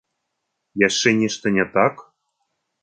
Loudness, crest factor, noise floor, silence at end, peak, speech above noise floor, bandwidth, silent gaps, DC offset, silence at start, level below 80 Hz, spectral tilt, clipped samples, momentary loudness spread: -19 LUFS; 20 dB; -77 dBFS; 0.8 s; -2 dBFS; 58 dB; 9.4 kHz; none; under 0.1%; 0.75 s; -60 dBFS; -4 dB/octave; under 0.1%; 4 LU